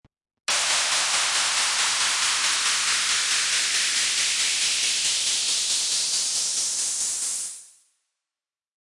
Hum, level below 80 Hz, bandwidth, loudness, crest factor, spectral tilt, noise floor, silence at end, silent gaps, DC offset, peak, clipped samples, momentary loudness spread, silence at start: none; -66 dBFS; 12 kHz; -21 LUFS; 14 dB; 3.5 dB/octave; under -90 dBFS; 1.15 s; none; under 0.1%; -10 dBFS; under 0.1%; 4 LU; 0.5 s